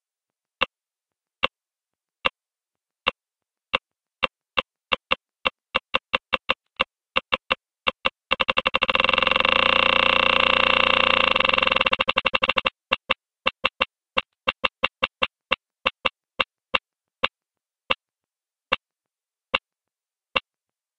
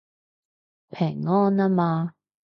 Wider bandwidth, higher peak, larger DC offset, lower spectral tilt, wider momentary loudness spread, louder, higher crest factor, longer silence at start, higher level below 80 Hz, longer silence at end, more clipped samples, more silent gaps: first, 9.8 kHz vs 5.6 kHz; first, -2 dBFS vs -10 dBFS; neither; second, -3.5 dB/octave vs -10.5 dB/octave; about the same, 11 LU vs 11 LU; about the same, -22 LUFS vs -23 LUFS; first, 24 dB vs 14 dB; second, 0.6 s vs 0.95 s; first, -54 dBFS vs -70 dBFS; first, 0.6 s vs 0.45 s; neither; neither